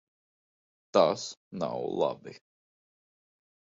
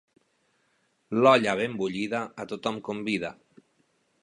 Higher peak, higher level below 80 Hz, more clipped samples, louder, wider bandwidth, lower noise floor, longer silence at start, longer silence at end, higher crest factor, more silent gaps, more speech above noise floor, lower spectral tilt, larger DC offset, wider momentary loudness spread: about the same, -8 dBFS vs -6 dBFS; second, -74 dBFS vs -68 dBFS; neither; second, -30 LUFS vs -26 LUFS; second, 7.8 kHz vs 11.5 kHz; first, under -90 dBFS vs -71 dBFS; second, 0.95 s vs 1.1 s; first, 1.4 s vs 0.9 s; about the same, 26 dB vs 22 dB; first, 1.37-1.51 s vs none; first, over 61 dB vs 45 dB; about the same, -5 dB/octave vs -5.5 dB/octave; neither; first, 16 LU vs 13 LU